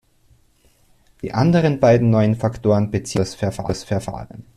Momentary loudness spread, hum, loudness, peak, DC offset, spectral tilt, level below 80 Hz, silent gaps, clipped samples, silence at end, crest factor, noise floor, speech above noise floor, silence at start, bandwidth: 12 LU; none; -19 LUFS; -4 dBFS; under 0.1%; -7 dB/octave; -46 dBFS; none; under 0.1%; 0.15 s; 16 dB; -57 dBFS; 39 dB; 1.25 s; 13 kHz